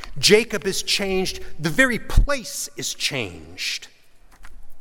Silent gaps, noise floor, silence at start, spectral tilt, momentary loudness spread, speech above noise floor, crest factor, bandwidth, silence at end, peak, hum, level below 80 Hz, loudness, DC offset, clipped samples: none; -44 dBFS; 0 s; -3 dB/octave; 12 LU; 23 dB; 20 dB; 17.5 kHz; 0 s; -2 dBFS; none; -28 dBFS; -22 LUFS; under 0.1%; under 0.1%